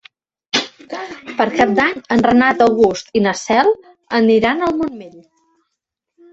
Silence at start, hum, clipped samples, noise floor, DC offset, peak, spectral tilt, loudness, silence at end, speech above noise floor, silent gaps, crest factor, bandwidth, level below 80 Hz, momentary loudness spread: 0.55 s; none; under 0.1%; -78 dBFS; under 0.1%; 0 dBFS; -4.5 dB/octave; -15 LUFS; 1.15 s; 63 dB; none; 16 dB; 8 kHz; -50 dBFS; 14 LU